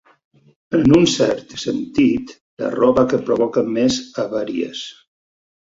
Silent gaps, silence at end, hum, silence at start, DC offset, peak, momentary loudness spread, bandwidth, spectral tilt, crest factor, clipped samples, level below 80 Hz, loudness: 2.41-2.57 s; 0.85 s; none; 0.7 s; under 0.1%; -2 dBFS; 13 LU; 7.8 kHz; -5.5 dB/octave; 18 dB; under 0.1%; -48 dBFS; -18 LUFS